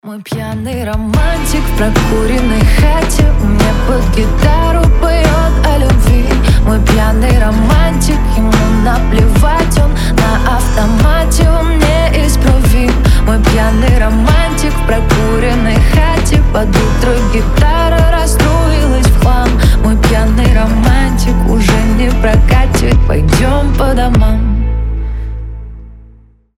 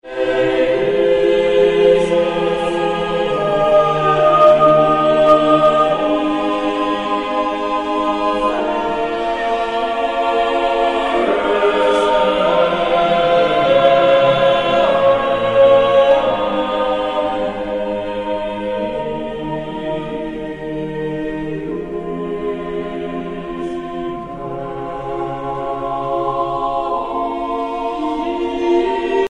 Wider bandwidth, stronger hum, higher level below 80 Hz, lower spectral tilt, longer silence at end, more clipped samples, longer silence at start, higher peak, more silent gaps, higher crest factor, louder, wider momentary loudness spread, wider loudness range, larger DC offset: first, 15.5 kHz vs 10.5 kHz; neither; first, -10 dBFS vs -42 dBFS; about the same, -6 dB/octave vs -6 dB/octave; first, 0.6 s vs 0 s; neither; about the same, 0.05 s vs 0.05 s; about the same, 0 dBFS vs 0 dBFS; neither; second, 8 dB vs 16 dB; first, -11 LUFS vs -16 LUFS; second, 4 LU vs 13 LU; second, 1 LU vs 11 LU; neither